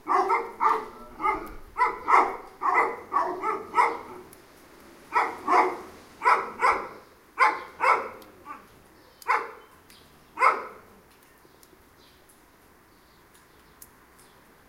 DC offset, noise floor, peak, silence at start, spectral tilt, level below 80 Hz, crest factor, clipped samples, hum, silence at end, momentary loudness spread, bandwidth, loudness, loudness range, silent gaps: under 0.1%; -57 dBFS; -6 dBFS; 0.05 s; -3.5 dB/octave; -58 dBFS; 22 dB; under 0.1%; none; 3.9 s; 21 LU; 16 kHz; -25 LUFS; 7 LU; none